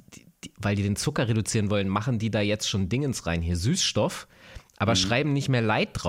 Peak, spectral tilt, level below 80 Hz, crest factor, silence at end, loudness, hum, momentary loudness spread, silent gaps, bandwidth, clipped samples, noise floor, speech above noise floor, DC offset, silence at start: -12 dBFS; -4.5 dB/octave; -50 dBFS; 14 dB; 0 s; -26 LUFS; none; 6 LU; none; 16 kHz; under 0.1%; -47 dBFS; 21 dB; under 0.1%; 0.1 s